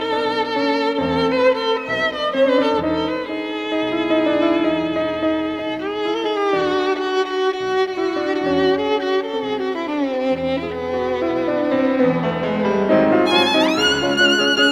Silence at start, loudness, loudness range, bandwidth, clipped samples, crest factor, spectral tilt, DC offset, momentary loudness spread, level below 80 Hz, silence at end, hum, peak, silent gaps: 0 s; -19 LUFS; 3 LU; 13.5 kHz; under 0.1%; 16 dB; -4.5 dB/octave; under 0.1%; 8 LU; -52 dBFS; 0 s; none; -4 dBFS; none